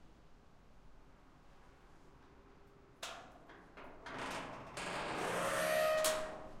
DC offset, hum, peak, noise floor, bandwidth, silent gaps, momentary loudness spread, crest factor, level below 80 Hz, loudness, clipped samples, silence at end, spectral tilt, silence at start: under 0.1%; none; -20 dBFS; -62 dBFS; 16.5 kHz; none; 22 LU; 22 dB; -64 dBFS; -39 LUFS; under 0.1%; 0 s; -2.5 dB/octave; 0 s